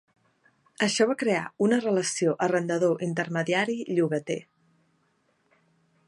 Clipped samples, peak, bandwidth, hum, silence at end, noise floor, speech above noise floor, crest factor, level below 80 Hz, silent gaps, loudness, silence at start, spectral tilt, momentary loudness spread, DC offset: under 0.1%; -8 dBFS; 11.5 kHz; none; 1.65 s; -70 dBFS; 44 dB; 18 dB; -76 dBFS; none; -26 LUFS; 0.8 s; -4.5 dB/octave; 5 LU; under 0.1%